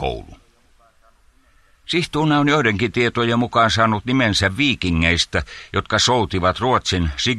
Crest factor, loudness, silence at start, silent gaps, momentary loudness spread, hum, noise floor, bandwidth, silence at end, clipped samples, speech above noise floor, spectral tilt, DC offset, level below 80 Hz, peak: 16 dB; -18 LUFS; 0 s; none; 7 LU; none; -55 dBFS; 12.5 kHz; 0 s; under 0.1%; 37 dB; -4.5 dB/octave; under 0.1%; -38 dBFS; -2 dBFS